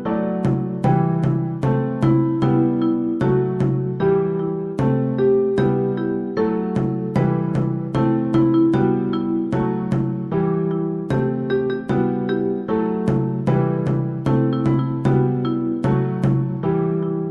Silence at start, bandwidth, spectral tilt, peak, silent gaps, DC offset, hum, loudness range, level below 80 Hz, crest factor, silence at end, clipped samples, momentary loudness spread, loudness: 0 s; 5.8 kHz; -10 dB/octave; -6 dBFS; none; under 0.1%; none; 2 LU; -46 dBFS; 14 dB; 0 s; under 0.1%; 4 LU; -20 LUFS